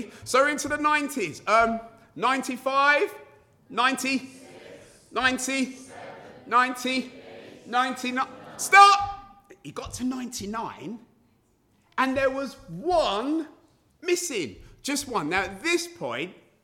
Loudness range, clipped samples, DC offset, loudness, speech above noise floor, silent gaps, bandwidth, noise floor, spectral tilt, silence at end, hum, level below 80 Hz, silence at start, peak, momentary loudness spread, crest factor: 7 LU; under 0.1%; under 0.1%; -24 LUFS; 41 dB; none; 19 kHz; -65 dBFS; -2.5 dB/octave; 0.3 s; none; -56 dBFS; 0 s; -2 dBFS; 19 LU; 24 dB